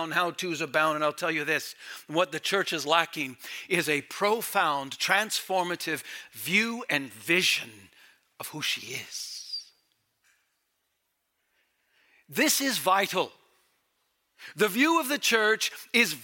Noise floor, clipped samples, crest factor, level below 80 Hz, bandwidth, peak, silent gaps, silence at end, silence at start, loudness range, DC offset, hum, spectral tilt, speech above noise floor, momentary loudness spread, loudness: -78 dBFS; under 0.1%; 22 dB; -84 dBFS; 17 kHz; -6 dBFS; none; 0 s; 0 s; 10 LU; under 0.1%; none; -2 dB/octave; 50 dB; 13 LU; -27 LUFS